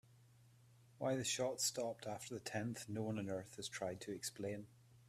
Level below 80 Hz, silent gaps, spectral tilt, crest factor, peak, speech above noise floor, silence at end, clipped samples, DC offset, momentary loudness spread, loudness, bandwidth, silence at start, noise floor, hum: -78 dBFS; none; -3.5 dB/octave; 20 dB; -26 dBFS; 24 dB; 0 s; under 0.1%; under 0.1%; 9 LU; -43 LUFS; 15.5 kHz; 0.1 s; -67 dBFS; none